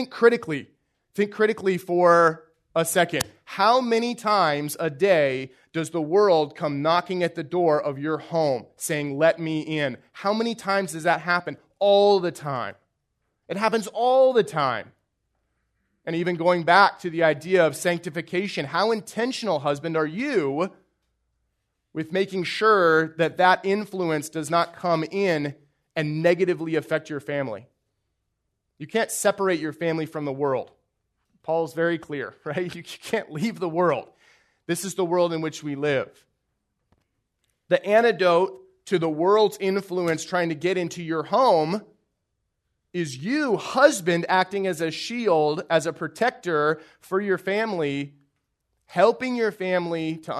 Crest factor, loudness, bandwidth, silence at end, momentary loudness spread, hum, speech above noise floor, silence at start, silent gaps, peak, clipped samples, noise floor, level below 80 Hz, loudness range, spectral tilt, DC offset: 22 dB; -23 LUFS; 13.5 kHz; 0 s; 11 LU; none; 55 dB; 0 s; none; -2 dBFS; under 0.1%; -78 dBFS; -70 dBFS; 6 LU; -5 dB/octave; under 0.1%